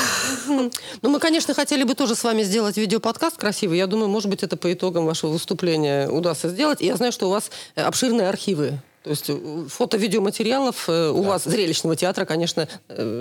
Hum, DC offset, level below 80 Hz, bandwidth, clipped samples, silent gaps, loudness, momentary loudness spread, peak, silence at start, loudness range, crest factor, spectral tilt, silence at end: none; under 0.1%; -72 dBFS; 19 kHz; under 0.1%; none; -22 LUFS; 6 LU; -2 dBFS; 0 s; 2 LU; 20 dB; -4 dB/octave; 0 s